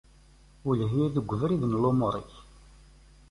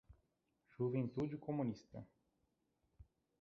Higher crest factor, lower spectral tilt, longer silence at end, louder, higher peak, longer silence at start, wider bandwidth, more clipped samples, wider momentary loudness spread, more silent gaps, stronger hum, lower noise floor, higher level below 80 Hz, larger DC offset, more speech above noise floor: about the same, 18 dB vs 18 dB; about the same, -9.5 dB/octave vs -9.5 dB/octave; first, 0.9 s vs 0.4 s; first, -28 LUFS vs -43 LUFS; first, -12 dBFS vs -28 dBFS; first, 0.65 s vs 0.1 s; first, 11.5 kHz vs 6.6 kHz; neither; second, 12 LU vs 17 LU; neither; neither; second, -56 dBFS vs -84 dBFS; first, -52 dBFS vs -72 dBFS; neither; second, 29 dB vs 42 dB